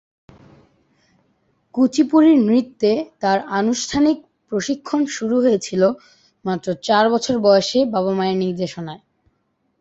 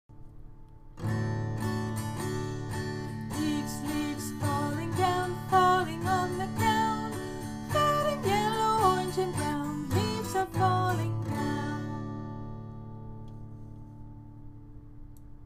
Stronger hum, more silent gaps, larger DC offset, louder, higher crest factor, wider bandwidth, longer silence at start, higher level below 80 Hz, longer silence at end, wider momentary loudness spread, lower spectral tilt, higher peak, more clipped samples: neither; neither; neither; first, -18 LUFS vs -30 LUFS; about the same, 16 dB vs 18 dB; second, 8.2 kHz vs 15.5 kHz; first, 1.75 s vs 0.1 s; second, -56 dBFS vs -50 dBFS; first, 0.85 s vs 0 s; second, 12 LU vs 20 LU; about the same, -5 dB/octave vs -5.5 dB/octave; first, -2 dBFS vs -12 dBFS; neither